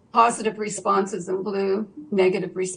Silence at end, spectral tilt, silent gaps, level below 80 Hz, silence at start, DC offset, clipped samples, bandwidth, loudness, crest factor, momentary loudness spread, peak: 0 s; -4.5 dB/octave; none; -68 dBFS; 0.15 s; under 0.1%; under 0.1%; 10 kHz; -23 LUFS; 20 dB; 8 LU; -4 dBFS